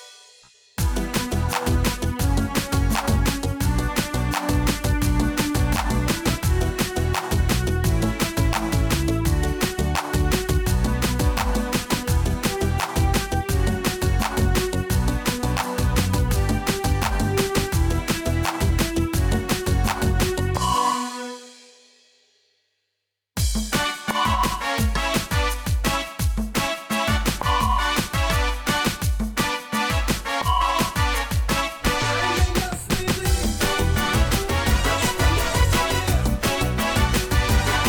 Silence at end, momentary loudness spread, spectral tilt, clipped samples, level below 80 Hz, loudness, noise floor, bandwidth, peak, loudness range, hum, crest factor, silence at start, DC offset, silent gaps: 0 s; 3 LU; -4.5 dB/octave; under 0.1%; -26 dBFS; -22 LUFS; -79 dBFS; over 20 kHz; -10 dBFS; 3 LU; none; 12 dB; 0 s; under 0.1%; none